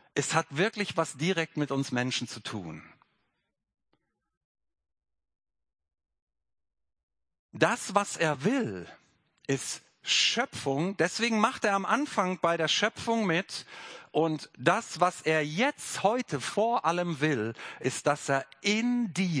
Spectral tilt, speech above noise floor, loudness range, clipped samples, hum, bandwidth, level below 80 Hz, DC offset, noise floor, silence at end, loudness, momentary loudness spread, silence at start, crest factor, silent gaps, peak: -4 dB/octave; 52 dB; 8 LU; under 0.1%; none; 10.5 kHz; -74 dBFS; under 0.1%; -81 dBFS; 0 s; -29 LUFS; 11 LU; 0.15 s; 24 dB; 4.37-4.55 s, 6.22-6.27 s, 7.03-7.08 s, 7.39-7.49 s; -8 dBFS